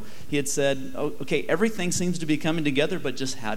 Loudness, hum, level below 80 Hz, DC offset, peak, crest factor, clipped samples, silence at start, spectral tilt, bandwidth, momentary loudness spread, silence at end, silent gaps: -26 LUFS; none; -56 dBFS; 4%; -8 dBFS; 18 dB; under 0.1%; 0 s; -4.5 dB/octave; 17 kHz; 6 LU; 0 s; none